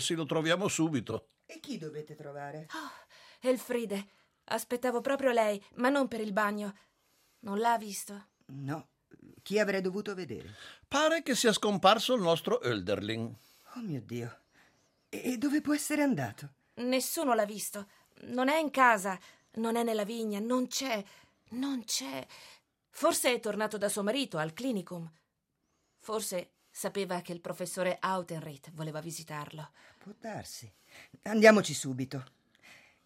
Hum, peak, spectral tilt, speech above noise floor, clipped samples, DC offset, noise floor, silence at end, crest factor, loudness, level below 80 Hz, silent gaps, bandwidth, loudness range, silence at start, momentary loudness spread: none; -6 dBFS; -4 dB/octave; 48 dB; under 0.1%; under 0.1%; -80 dBFS; 0.3 s; 26 dB; -31 LUFS; -78 dBFS; none; 16 kHz; 8 LU; 0 s; 18 LU